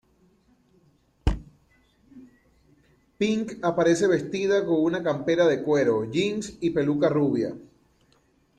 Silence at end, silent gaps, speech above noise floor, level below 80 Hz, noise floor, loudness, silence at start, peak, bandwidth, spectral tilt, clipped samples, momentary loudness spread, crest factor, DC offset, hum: 0.95 s; none; 40 dB; -42 dBFS; -64 dBFS; -24 LUFS; 1.25 s; -8 dBFS; 10 kHz; -6 dB/octave; under 0.1%; 8 LU; 18 dB; under 0.1%; none